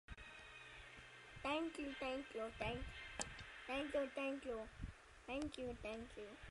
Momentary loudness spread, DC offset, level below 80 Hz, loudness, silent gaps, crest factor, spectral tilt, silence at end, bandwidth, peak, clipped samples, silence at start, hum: 13 LU; under 0.1%; -62 dBFS; -48 LUFS; none; 26 dB; -4 dB/octave; 0 s; 11.5 kHz; -22 dBFS; under 0.1%; 0.1 s; none